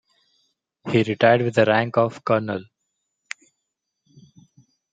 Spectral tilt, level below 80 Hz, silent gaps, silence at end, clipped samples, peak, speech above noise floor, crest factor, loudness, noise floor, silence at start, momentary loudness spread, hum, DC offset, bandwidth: -6.5 dB/octave; -66 dBFS; none; 2.3 s; under 0.1%; -2 dBFS; 60 dB; 22 dB; -20 LUFS; -80 dBFS; 0.85 s; 20 LU; none; under 0.1%; 9 kHz